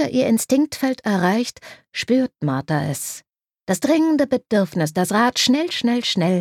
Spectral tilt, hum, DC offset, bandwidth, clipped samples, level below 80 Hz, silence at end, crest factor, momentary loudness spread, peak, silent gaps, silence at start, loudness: -4.5 dB/octave; none; under 0.1%; 16.5 kHz; under 0.1%; -60 dBFS; 0 s; 16 dB; 10 LU; -4 dBFS; none; 0 s; -20 LUFS